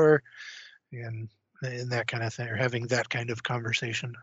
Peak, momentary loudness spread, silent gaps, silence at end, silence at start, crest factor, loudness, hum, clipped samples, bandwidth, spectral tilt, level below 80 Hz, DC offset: -8 dBFS; 16 LU; none; 0 s; 0 s; 22 dB; -30 LUFS; none; under 0.1%; 8 kHz; -4 dB/octave; -70 dBFS; under 0.1%